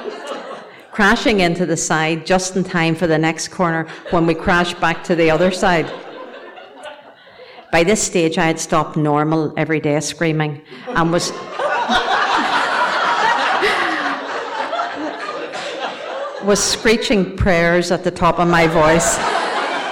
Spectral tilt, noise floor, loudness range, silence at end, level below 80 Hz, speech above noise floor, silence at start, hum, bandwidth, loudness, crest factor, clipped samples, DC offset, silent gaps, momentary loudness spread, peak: -4 dB/octave; -41 dBFS; 4 LU; 0 s; -38 dBFS; 25 dB; 0 s; none; 18 kHz; -17 LUFS; 12 dB; under 0.1%; under 0.1%; none; 12 LU; -6 dBFS